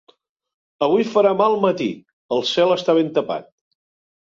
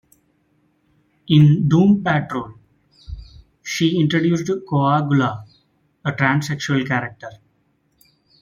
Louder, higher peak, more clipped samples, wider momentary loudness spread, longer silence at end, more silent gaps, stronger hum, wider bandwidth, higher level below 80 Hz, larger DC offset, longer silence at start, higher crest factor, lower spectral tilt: about the same, -19 LUFS vs -18 LUFS; about the same, -4 dBFS vs -2 dBFS; neither; second, 11 LU vs 24 LU; second, 0.9 s vs 1.1 s; first, 2.13-2.29 s vs none; neither; about the same, 7.6 kHz vs 7.4 kHz; second, -66 dBFS vs -50 dBFS; neither; second, 0.8 s vs 1.3 s; about the same, 16 dB vs 18 dB; about the same, -5.5 dB/octave vs -6.5 dB/octave